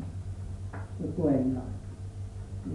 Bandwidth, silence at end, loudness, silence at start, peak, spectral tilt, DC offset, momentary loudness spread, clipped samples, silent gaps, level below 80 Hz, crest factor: 11 kHz; 0 s; -34 LUFS; 0 s; -16 dBFS; -9.5 dB/octave; under 0.1%; 14 LU; under 0.1%; none; -46 dBFS; 18 dB